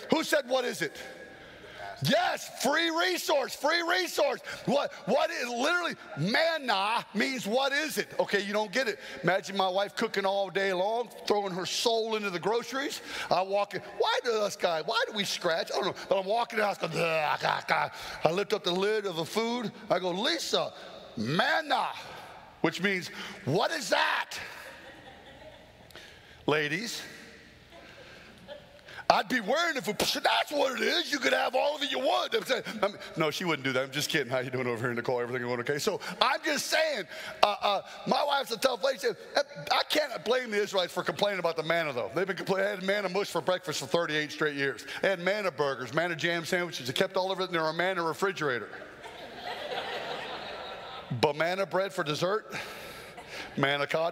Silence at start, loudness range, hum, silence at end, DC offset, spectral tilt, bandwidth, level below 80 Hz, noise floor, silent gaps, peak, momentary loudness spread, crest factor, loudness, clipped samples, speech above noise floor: 0 s; 4 LU; none; 0 s; under 0.1%; -3.5 dB/octave; 16 kHz; -70 dBFS; -52 dBFS; none; -2 dBFS; 13 LU; 28 dB; -29 LUFS; under 0.1%; 23 dB